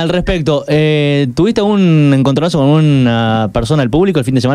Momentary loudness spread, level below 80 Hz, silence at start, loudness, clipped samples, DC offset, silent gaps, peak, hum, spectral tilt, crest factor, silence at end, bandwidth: 4 LU; -32 dBFS; 0 s; -11 LUFS; under 0.1%; under 0.1%; none; 0 dBFS; none; -7 dB/octave; 10 dB; 0 s; 11.5 kHz